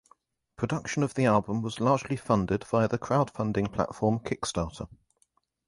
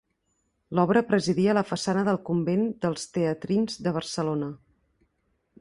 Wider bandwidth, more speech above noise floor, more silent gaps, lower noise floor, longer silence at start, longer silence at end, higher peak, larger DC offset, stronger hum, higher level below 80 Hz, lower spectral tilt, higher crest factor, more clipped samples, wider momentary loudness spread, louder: about the same, 11.5 kHz vs 11.5 kHz; second, 44 dB vs 49 dB; neither; about the same, -71 dBFS vs -74 dBFS; about the same, 0.6 s vs 0.7 s; second, 0.75 s vs 1.05 s; about the same, -8 dBFS vs -8 dBFS; neither; neither; first, -52 dBFS vs -62 dBFS; about the same, -6.5 dB/octave vs -6 dB/octave; about the same, 20 dB vs 20 dB; neither; about the same, 8 LU vs 7 LU; about the same, -28 LUFS vs -26 LUFS